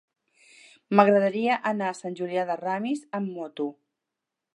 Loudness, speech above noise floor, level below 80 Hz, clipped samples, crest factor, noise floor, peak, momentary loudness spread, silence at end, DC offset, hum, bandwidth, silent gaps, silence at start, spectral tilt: -26 LUFS; 61 dB; -82 dBFS; under 0.1%; 24 dB; -86 dBFS; -2 dBFS; 13 LU; 0.85 s; under 0.1%; none; 11 kHz; none; 0.9 s; -6.5 dB/octave